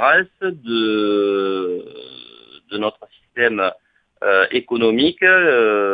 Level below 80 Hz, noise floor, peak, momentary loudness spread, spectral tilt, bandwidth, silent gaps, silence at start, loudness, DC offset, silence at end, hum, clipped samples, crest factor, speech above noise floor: -62 dBFS; -44 dBFS; 0 dBFS; 16 LU; -7 dB/octave; 5 kHz; none; 0 s; -17 LUFS; under 0.1%; 0 s; none; under 0.1%; 18 dB; 27 dB